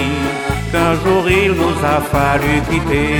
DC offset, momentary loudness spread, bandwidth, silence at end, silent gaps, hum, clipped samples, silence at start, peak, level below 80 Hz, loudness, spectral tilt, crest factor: under 0.1%; 5 LU; 19 kHz; 0 s; none; none; under 0.1%; 0 s; -2 dBFS; -28 dBFS; -15 LUFS; -6 dB/octave; 14 dB